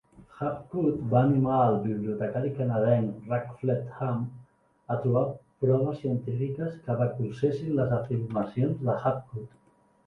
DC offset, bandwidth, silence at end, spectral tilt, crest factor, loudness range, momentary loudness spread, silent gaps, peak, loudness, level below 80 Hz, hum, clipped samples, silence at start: under 0.1%; 4.8 kHz; 0.6 s; -10.5 dB/octave; 20 dB; 3 LU; 10 LU; none; -8 dBFS; -28 LUFS; -60 dBFS; none; under 0.1%; 0.2 s